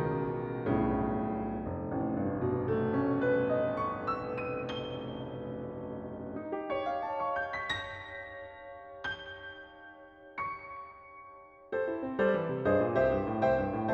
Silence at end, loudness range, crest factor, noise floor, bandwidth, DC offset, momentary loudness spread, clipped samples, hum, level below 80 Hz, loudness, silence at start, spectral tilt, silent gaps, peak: 0 s; 9 LU; 16 dB; -53 dBFS; 8.2 kHz; under 0.1%; 18 LU; under 0.1%; none; -54 dBFS; -33 LUFS; 0 s; -8 dB/octave; none; -16 dBFS